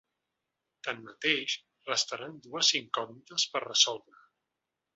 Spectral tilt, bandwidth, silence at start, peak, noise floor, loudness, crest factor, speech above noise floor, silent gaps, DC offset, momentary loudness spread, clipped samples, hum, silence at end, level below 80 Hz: 0 dB/octave; 8.4 kHz; 0.85 s; -8 dBFS; -87 dBFS; -29 LUFS; 26 dB; 55 dB; none; under 0.1%; 14 LU; under 0.1%; none; 1 s; -82 dBFS